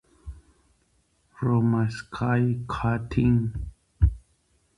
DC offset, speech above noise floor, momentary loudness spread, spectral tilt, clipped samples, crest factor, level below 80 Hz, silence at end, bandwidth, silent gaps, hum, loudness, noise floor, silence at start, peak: under 0.1%; 43 dB; 22 LU; -8.5 dB/octave; under 0.1%; 18 dB; -36 dBFS; 0.6 s; 10.5 kHz; none; none; -25 LUFS; -67 dBFS; 0.25 s; -8 dBFS